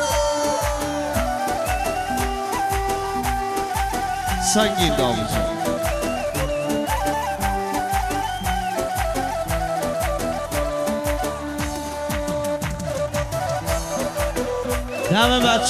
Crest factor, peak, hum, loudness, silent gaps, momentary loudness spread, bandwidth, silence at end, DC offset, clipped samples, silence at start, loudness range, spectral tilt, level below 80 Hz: 18 dB; -4 dBFS; none; -23 LUFS; none; 6 LU; 14.5 kHz; 0 s; under 0.1%; under 0.1%; 0 s; 3 LU; -4 dB/octave; -32 dBFS